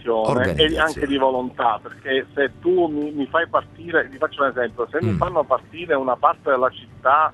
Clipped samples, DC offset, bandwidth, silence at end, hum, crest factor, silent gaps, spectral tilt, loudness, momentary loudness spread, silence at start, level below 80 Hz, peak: under 0.1%; under 0.1%; 12 kHz; 0 s; none; 20 dB; none; -6 dB/octave; -21 LUFS; 6 LU; 0 s; -44 dBFS; 0 dBFS